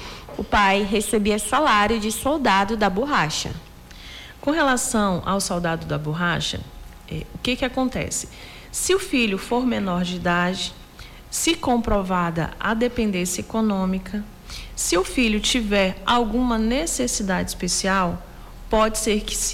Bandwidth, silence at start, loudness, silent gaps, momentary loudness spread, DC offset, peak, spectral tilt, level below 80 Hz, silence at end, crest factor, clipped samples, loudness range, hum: 16.5 kHz; 0 s; -22 LUFS; none; 14 LU; under 0.1%; -10 dBFS; -3.5 dB/octave; -38 dBFS; 0 s; 12 dB; under 0.1%; 4 LU; none